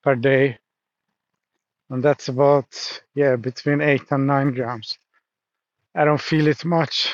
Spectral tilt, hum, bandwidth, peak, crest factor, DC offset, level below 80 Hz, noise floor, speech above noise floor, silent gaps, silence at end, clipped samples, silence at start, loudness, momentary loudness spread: -6 dB/octave; none; 7.6 kHz; -4 dBFS; 16 dB; under 0.1%; -72 dBFS; -85 dBFS; 65 dB; none; 0 s; under 0.1%; 0.05 s; -20 LUFS; 12 LU